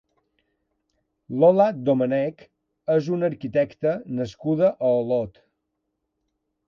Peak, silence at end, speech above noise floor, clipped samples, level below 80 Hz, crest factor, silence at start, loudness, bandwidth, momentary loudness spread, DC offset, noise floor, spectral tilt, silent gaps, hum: -6 dBFS; 1.4 s; 56 dB; under 0.1%; -64 dBFS; 18 dB; 1.3 s; -22 LUFS; 7 kHz; 12 LU; under 0.1%; -78 dBFS; -8.5 dB/octave; none; none